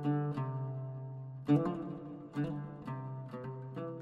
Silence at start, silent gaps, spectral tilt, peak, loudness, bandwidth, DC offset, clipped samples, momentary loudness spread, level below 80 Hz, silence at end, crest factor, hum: 0 s; none; -10 dB/octave; -18 dBFS; -38 LUFS; 5 kHz; under 0.1%; under 0.1%; 13 LU; -70 dBFS; 0 s; 20 dB; none